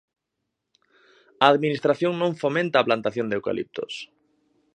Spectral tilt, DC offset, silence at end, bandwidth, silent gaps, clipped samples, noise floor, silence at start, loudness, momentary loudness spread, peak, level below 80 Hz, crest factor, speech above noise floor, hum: -6 dB/octave; under 0.1%; 0.7 s; 9.6 kHz; none; under 0.1%; -81 dBFS; 1.4 s; -23 LUFS; 14 LU; 0 dBFS; -68 dBFS; 24 dB; 58 dB; none